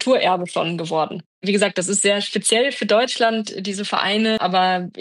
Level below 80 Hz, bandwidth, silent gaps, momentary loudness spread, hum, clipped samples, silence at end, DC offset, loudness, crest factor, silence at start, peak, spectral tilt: -74 dBFS; 12.5 kHz; 1.26-1.42 s; 7 LU; none; under 0.1%; 0 s; under 0.1%; -19 LUFS; 16 dB; 0 s; -4 dBFS; -3 dB/octave